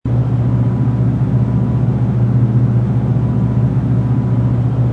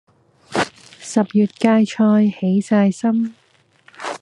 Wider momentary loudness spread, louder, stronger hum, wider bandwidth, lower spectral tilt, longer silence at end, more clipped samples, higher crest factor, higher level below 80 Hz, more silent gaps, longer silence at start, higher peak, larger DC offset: second, 2 LU vs 12 LU; first, -15 LUFS vs -18 LUFS; neither; second, 3.3 kHz vs 11 kHz; first, -11 dB/octave vs -6.5 dB/octave; about the same, 0 s vs 0.05 s; neither; second, 10 dB vs 16 dB; first, -30 dBFS vs -64 dBFS; neither; second, 0.05 s vs 0.5 s; about the same, -4 dBFS vs -2 dBFS; neither